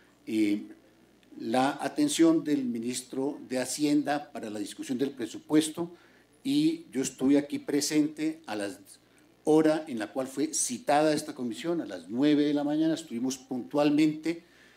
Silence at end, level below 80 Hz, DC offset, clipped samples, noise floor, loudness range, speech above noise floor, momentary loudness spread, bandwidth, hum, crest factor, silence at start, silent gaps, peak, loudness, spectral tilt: 0.4 s; -76 dBFS; under 0.1%; under 0.1%; -60 dBFS; 3 LU; 32 dB; 12 LU; 16 kHz; none; 18 dB; 0.25 s; none; -10 dBFS; -29 LUFS; -4.5 dB/octave